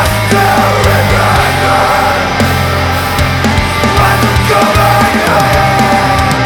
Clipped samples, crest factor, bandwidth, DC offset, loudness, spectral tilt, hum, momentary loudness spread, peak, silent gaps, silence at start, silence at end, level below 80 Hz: under 0.1%; 8 dB; over 20 kHz; under 0.1%; -9 LUFS; -5 dB/octave; none; 3 LU; 0 dBFS; none; 0 s; 0 s; -22 dBFS